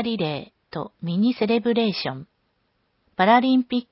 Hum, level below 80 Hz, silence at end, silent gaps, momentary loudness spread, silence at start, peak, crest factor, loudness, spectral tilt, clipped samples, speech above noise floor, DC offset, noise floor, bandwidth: none; -64 dBFS; 0.1 s; none; 17 LU; 0 s; -4 dBFS; 18 dB; -21 LUFS; -10 dB/octave; under 0.1%; 48 dB; under 0.1%; -70 dBFS; 5.8 kHz